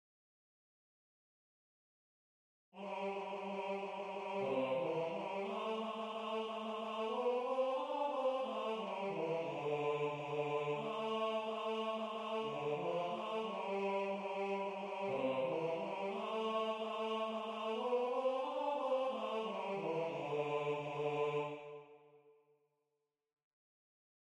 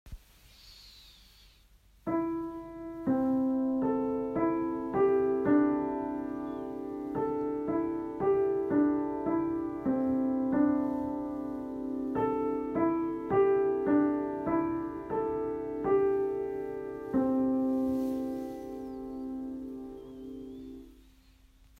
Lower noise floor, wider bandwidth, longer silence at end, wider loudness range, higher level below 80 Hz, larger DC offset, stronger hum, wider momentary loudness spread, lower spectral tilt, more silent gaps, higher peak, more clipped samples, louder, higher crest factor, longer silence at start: first, -88 dBFS vs -61 dBFS; first, 10.5 kHz vs 7 kHz; first, 2.05 s vs 0.85 s; about the same, 6 LU vs 5 LU; second, -86 dBFS vs -58 dBFS; neither; neither; second, 5 LU vs 14 LU; second, -6 dB/octave vs -8.5 dB/octave; neither; second, -26 dBFS vs -14 dBFS; neither; second, -40 LUFS vs -31 LUFS; about the same, 14 dB vs 16 dB; first, 2.75 s vs 0.05 s